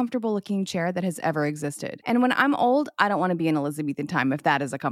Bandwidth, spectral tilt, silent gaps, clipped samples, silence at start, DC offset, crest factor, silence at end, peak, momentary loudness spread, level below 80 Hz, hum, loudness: 15 kHz; -5.5 dB/octave; none; under 0.1%; 0 s; under 0.1%; 20 dB; 0 s; -4 dBFS; 8 LU; -72 dBFS; none; -24 LUFS